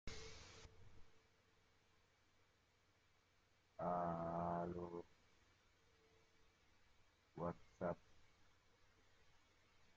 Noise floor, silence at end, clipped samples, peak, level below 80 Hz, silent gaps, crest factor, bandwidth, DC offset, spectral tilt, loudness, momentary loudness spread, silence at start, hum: -78 dBFS; 0.05 s; under 0.1%; -32 dBFS; -72 dBFS; none; 20 dB; 7.6 kHz; under 0.1%; -6 dB/octave; -48 LUFS; 20 LU; 0.05 s; none